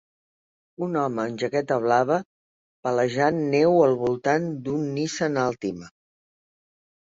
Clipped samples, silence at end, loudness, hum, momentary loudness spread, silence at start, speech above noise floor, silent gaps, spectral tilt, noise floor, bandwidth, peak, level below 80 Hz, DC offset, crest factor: under 0.1%; 1.25 s; -24 LUFS; none; 9 LU; 0.8 s; over 67 dB; 2.25-2.83 s; -6 dB/octave; under -90 dBFS; 7.8 kHz; -6 dBFS; -64 dBFS; under 0.1%; 18 dB